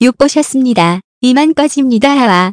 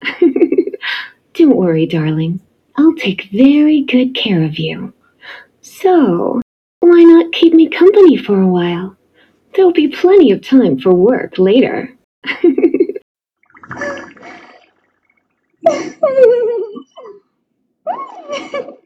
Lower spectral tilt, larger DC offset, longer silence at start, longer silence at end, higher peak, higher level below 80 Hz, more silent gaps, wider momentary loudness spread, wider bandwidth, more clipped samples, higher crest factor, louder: second, -5 dB/octave vs -7.5 dB/octave; neither; about the same, 0 s vs 0 s; second, 0 s vs 0.15 s; about the same, 0 dBFS vs 0 dBFS; first, -48 dBFS vs -58 dBFS; second, 1.04-1.21 s vs 6.42-6.81 s, 12.04-12.22 s, 13.02-13.15 s; second, 3 LU vs 17 LU; first, 11 kHz vs 6.8 kHz; first, 1% vs 0.3%; about the same, 10 dB vs 12 dB; about the same, -10 LUFS vs -11 LUFS